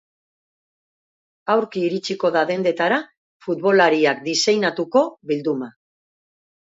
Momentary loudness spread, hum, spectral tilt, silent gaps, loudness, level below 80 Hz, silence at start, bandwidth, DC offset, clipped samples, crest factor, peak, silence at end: 11 LU; none; -4 dB/octave; 3.17-3.40 s; -20 LUFS; -74 dBFS; 1.45 s; 8 kHz; under 0.1%; under 0.1%; 18 dB; -4 dBFS; 0.95 s